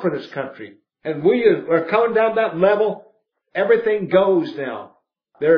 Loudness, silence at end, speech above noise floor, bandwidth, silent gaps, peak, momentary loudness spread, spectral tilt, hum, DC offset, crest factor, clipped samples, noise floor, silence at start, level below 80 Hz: -19 LUFS; 0 s; 21 dB; 5.4 kHz; none; -2 dBFS; 14 LU; -8.5 dB/octave; none; under 0.1%; 16 dB; under 0.1%; -40 dBFS; 0 s; -66 dBFS